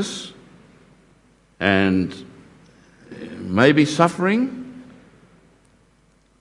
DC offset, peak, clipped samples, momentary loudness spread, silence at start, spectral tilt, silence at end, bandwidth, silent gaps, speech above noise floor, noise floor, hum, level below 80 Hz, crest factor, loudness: under 0.1%; 0 dBFS; under 0.1%; 24 LU; 0 s; -5.5 dB/octave; 1.6 s; 11.5 kHz; none; 40 dB; -58 dBFS; none; -62 dBFS; 22 dB; -19 LUFS